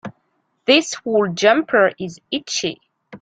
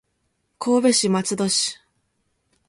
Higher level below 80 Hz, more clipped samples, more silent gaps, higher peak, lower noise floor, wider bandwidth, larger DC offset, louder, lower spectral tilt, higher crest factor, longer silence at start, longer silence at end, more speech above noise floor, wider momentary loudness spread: about the same, -64 dBFS vs -66 dBFS; neither; neither; first, -2 dBFS vs -6 dBFS; second, -67 dBFS vs -72 dBFS; second, 9.4 kHz vs 11.5 kHz; neither; about the same, -18 LUFS vs -20 LUFS; about the same, -3 dB/octave vs -3.5 dB/octave; about the same, 18 dB vs 18 dB; second, 0.05 s vs 0.6 s; second, 0.05 s vs 0.95 s; about the same, 50 dB vs 52 dB; first, 12 LU vs 8 LU